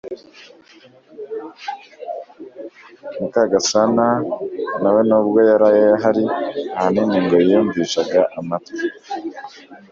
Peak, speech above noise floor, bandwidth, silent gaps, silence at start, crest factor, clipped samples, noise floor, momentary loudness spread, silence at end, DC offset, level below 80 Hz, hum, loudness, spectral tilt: -2 dBFS; 22 dB; 7.6 kHz; none; 0.05 s; 18 dB; under 0.1%; -39 dBFS; 22 LU; 0.15 s; under 0.1%; -60 dBFS; none; -17 LUFS; -4.5 dB/octave